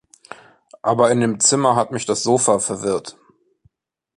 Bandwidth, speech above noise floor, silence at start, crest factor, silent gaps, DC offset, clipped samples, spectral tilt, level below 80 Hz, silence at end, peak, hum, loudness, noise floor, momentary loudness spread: 11.5 kHz; 46 dB; 0.3 s; 18 dB; none; under 0.1%; under 0.1%; -3.5 dB/octave; -60 dBFS; 1.05 s; -2 dBFS; none; -18 LUFS; -63 dBFS; 9 LU